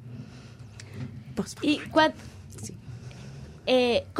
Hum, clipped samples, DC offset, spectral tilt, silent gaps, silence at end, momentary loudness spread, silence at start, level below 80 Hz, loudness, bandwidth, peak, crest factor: none; under 0.1%; under 0.1%; -5 dB/octave; none; 0 s; 21 LU; 0 s; -56 dBFS; -26 LUFS; 15 kHz; -8 dBFS; 22 dB